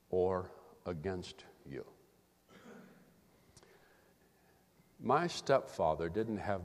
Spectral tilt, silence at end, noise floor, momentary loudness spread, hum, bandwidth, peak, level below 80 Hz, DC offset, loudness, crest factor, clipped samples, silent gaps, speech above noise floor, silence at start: -6 dB/octave; 0 s; -69 dBFS; 23 LU; none; 15 kHz; -16 dBFS; -66 dBFS; under 0.1%; -37 LUFS; 24 dB; under 0.1%; none; 33 dB; 0.1 s